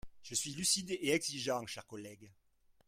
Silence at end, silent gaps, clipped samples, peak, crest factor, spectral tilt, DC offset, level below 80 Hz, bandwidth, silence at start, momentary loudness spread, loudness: 0.55 s; none; under 0.1%; -18 dBFS; 22 dB; -2 dB/octave; under 0.1%; -66 dBFS; 16.5 kHz; 0.05 s; 17 LU; -35 LUFS